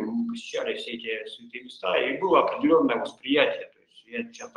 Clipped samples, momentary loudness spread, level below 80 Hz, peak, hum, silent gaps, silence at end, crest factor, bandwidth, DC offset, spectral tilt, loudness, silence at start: under 0.1%; 15 LU; -72 dBFS; -4 dBFS; none; none; 0.1 s; 22 dB; 10.5 kHz; under 0.1%; -4.5 dB/octave; -26 LUFS; 0 s